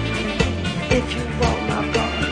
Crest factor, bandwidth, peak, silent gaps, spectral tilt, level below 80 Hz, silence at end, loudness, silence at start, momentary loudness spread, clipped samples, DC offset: 18 dB; 10.5 kHz; -4 dBFS; none; -5 dB/octave; -30 dBFS; 0 s; -21 LUFS; 0 s; 3 LU; under 0.1%; under 0.1%